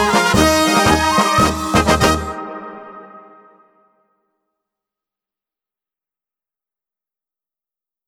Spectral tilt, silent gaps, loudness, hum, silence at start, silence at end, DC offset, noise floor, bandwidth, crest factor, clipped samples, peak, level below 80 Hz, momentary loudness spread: -4 dB/octave; none; -14 LUFS; none; 0 s; 4.9 s; under 0.1%; under -90 dBFS; 18 kHz; 20 dB; under 0.1%; 0 dBFS; -34 dBFS; 19 LU